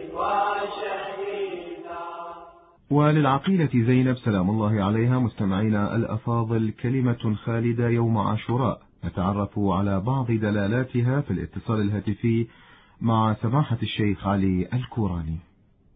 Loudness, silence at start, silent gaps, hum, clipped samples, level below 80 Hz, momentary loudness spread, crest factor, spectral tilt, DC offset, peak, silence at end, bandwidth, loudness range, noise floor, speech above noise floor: -24 LUFS; 0 s; none; none; under 0.1%; -46 dBFS; 10 LU; 16 dB; -12.5 dB/octave; under 0.1%; -8 dBFS; 0.55 s; 4.7 kHz; 3 LU; -49 dBFS; 26 dB